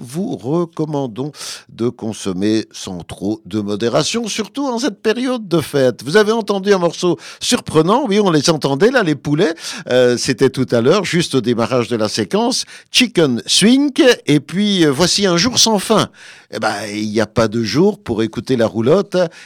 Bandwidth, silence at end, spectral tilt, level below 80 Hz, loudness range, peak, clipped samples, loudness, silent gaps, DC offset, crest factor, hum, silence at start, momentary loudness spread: 17.5 kHz; 0 s; -4.5 dB/octave; -52 dBFS; 7 LU; -2 dBFS; under 0.1%; -16 LUFS; none; under 0.1%; 14 dB; none; 0 s; 10 LU